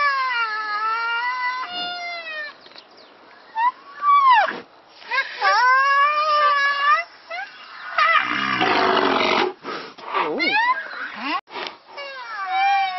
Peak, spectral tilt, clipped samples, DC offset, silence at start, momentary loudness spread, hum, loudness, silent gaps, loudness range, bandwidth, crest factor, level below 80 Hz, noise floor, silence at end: -2 dBFS; -3 dB/octave; under 0.1%; under 0.1%; 0 s; 16 LU; none; -19 LUFS; 11.41-11.47 s; 7 LU; 6.2 kHz; 18 dB; -68 dBFS; -47 dBFS; 0 s